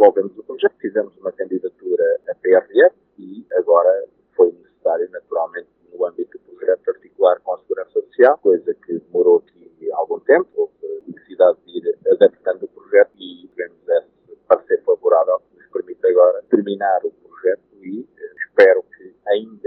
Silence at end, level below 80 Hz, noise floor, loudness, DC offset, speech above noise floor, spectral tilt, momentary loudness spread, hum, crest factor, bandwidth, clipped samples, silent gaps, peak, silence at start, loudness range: 0.2 s; -74 dBFS; -46 dBFS; -18 LUFS; under 0.1%; 28 dB; -7.5 dB/octave; 16 LU; none; 18 dB; 4.7 kHz; under 0.1%; none; 0 dBFS; 0 s; 3 LU